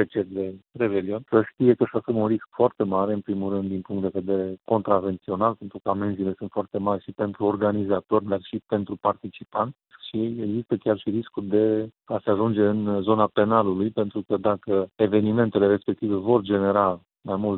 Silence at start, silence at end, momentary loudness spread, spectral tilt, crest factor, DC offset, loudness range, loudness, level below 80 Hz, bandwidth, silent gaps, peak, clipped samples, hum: 0 s; 0 s; 8 LU; -12 dB/octave; 20 dB; under 0.1%; 4 LU; -24 LUFS; -64 dBFS; 4.2 kHz; none; -4 dBFS; under 0.1%; none